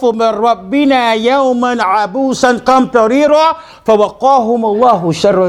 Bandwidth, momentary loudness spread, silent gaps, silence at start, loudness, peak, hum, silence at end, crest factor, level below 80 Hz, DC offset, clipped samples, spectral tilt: 13 kHz; 4 LU; none; 0 s; -11 LUFS; 0 dBFS; none; 0 s; 10 dB; -48 dBFS; under 0.1%; 0.2%; -5 dB/octave